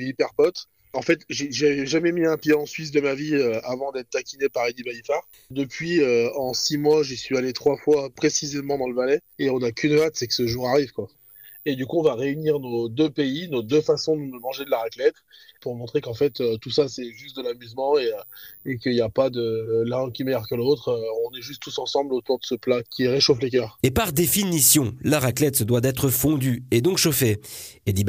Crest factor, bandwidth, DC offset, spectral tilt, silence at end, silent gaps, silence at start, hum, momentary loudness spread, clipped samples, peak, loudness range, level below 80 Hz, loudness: 18 dB; 16 kHz; under 0.1%; -4.5 dB/octave; 0 s; none; 0 s; none; 11 LU; under 0.1%; -6 dBFS; 6 LU; -52 dBFS; -23 LUFS